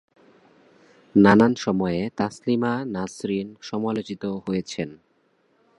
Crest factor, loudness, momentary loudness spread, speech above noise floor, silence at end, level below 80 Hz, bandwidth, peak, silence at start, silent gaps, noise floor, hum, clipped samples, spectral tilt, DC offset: 22 dB; -23 LUFS; 14 LU; 43 dB; 0.85 s; -56 dBFS; 11 kHz; -2 dBFS; 1.15 s; none; -65 dBFS; none; under 0.1%; -6.5 dB/octave; under 0.1%